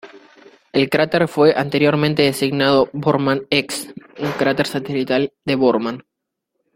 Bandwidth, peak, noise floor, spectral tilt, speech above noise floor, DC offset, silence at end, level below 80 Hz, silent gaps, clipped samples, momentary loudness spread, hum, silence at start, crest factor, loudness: 16.5 kHz; 0 dBFS; -78 dBFS; -5.5 dB/octave; 60 dB; under 0.1%; 0.75 s; -56 dBFS; none; under 0.1%; 11 LU; none; 0.05 s; 18 dB; -18 LUFS